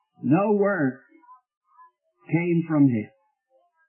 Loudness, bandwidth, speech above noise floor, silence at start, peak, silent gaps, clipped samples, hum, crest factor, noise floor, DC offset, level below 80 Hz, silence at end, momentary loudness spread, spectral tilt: -23 LUFS; 3 kHz; 45 dB; 0.25 s; -8 dBFS; 1.57-1.61 s; under 0.1%; none; 16 dB; -67 dBFS; under 0.1%; -74 dBFS; 0.8 s; 10 LU; -13 dB/octave